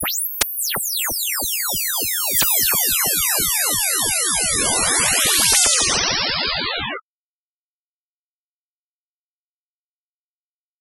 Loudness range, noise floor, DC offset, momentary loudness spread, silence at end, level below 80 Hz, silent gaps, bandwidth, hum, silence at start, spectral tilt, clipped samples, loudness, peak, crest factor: 10 LU; under -90 dBFS; under 0.1%; 7 LU; 3.8 s; -46 dBFS; none; 16 kHz; none; 0 s; 0 dB/octave; under 0.1%; -16 LUFS; 0 dBFS; 20 dB